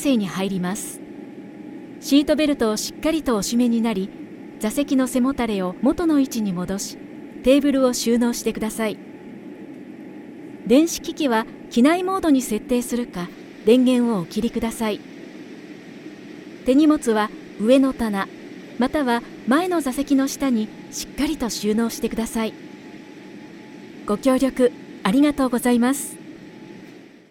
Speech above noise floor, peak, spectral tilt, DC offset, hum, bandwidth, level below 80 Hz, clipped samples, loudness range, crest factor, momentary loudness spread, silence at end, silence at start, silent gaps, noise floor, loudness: 24 dB; -2 dBFS; -4.5 dB/octave; under 0.1%; none; 17 kHz; -48 dBFS; under 0.1%; 4 LU; 18 dB; 21 LU; 0.3 s; 0 s; none; -44 dBFS; -21 LUFS